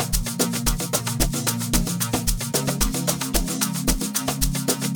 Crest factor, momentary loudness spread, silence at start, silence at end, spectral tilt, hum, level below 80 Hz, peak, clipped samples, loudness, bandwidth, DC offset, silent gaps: 18 dB; 2 LU; 0 s; 0 s; -3.5 dB/octave; none; -30 dBFS; -6 dBFS; under 0.1%; -23 LUFS; over 20 kHz; 0.3%; none